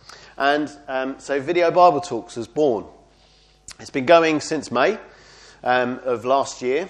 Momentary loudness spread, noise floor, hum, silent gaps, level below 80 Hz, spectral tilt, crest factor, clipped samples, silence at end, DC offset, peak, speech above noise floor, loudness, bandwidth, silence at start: 14 LU; -55 dBFS; none; none; -58 dBFS; -4.5 dB/octave; 20 dB; under 0.1%; 0 s; under 0.1%; 0 dBFS; 35 dB; -20 LUFS; 10.5 kHz; 0.1 s